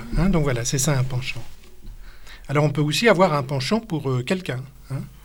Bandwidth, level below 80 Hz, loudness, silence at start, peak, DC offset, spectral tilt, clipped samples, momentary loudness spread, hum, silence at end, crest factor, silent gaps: 17.5 kHz; -36 dBFS; -22 LUFS; 0 s; -2 dBFS; under 0.1%; -5 dB/octave; under 0.1%; 15 LU; none; 0.1 s; 20 dB; none